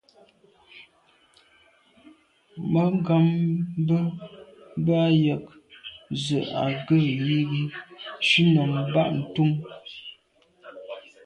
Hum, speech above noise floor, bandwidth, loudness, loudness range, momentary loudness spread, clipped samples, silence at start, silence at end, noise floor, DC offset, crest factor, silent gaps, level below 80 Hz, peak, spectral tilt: none; 39 dB; 9.2 kHz; -24 LUFS; 4 LU; 20 LU; under 0.1%; 0.75 s; 0.25 s; -62 dBFS; under 0.1%; 16 dB; none; -62 dBFS; -8 dBFS; -7 dB/octave